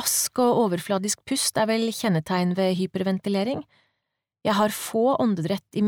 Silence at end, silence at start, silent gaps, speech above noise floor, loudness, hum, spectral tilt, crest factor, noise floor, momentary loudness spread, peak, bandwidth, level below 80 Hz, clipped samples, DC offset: 0 s; 0 s; none; 58 dB; -24 LUFS; none; -4.5 dB/octave; 14 dB; -82 dBFS; 5 LU; -10 dBFS; 20 kHz; -66 dBFS; under 0.1%; under 0.1%